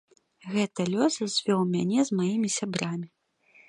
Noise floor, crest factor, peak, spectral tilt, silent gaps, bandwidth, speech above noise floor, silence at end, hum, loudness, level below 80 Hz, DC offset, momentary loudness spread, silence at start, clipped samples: -61 dBFS; 18 dB; -10 dBFS; -5 dB/octave; none; 11 kHz; 34 dB; 0.65 s; none; -27 LUFS; -72 dBFS; under 0.1%; 8 LU; 0.45 s; under 0.1%